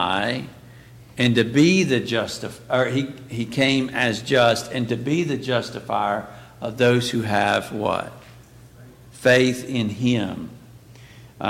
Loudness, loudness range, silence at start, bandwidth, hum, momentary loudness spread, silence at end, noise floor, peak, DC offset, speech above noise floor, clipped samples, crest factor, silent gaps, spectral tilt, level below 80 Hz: -21 LUFS; 3 LU; 0 s; 16.5 kHz; none; 13 LU; 0 s; -46 dBFS; -6 dBFS; under 0.1%; 25 dB; under 0.1%; 16 dB; none; -5 dB/octave; -56 dBFS